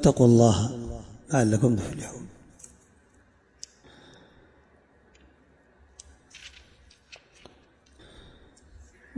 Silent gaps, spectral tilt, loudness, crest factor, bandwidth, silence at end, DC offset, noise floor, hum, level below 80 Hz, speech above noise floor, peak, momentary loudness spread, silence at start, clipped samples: none; -6.5 dB/octave; -23 LUFS; 22 dB; 11.5 kHz; 2.7 s; under 0.1%; -61 dBFS; none; -50 dBFS; 40 dB; -6 dBFS; 30 LU; 0 s; under 0.1%